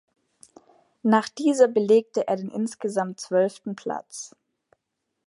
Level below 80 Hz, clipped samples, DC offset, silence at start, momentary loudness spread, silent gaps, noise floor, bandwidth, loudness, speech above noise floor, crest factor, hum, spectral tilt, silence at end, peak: -78 dBFS; under 0.1%; under 0.1%; 1.05 s; 14 LU; none; -80 dBFS; 11.5 kHz; -24 LUFS; 57 dB; 20 dB; none; -5.5 dB/octave; 1 s; -6 dBFS